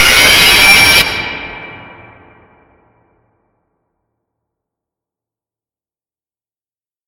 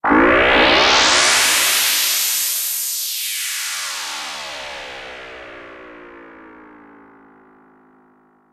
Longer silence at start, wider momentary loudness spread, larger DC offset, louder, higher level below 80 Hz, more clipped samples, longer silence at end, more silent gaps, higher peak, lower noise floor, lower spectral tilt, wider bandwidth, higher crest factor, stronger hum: about the same, 0 s vs 0.05 s; about the same, 23 LU vs 22 LU; neither; first, -5 LUFS vs -14 LUFS; first, -36 dBFS vs -44 dBFS; first, 0.1% vs under 0.1%; first, 5.25 s vs 1.95 s; neither; about the same, 0 dBFS vs -2 dBFS; first, under -90 dBFS vs -55 dBFS; about the same, -0.5 dB/octave vs -0.5 dB/octave; first, over 20 kHz vs 16 kHz; about the same, 14 dB vs 18 dB; neither